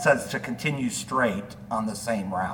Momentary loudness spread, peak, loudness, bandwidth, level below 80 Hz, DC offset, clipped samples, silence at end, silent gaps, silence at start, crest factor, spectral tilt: 6 LU; -4 dBFS; -27 LUFS; 19 kHz; -56 dBFS; under 0.1%; under 0.1%; 0 s; none; 0 s; 22 dB; -4.5 dB/octave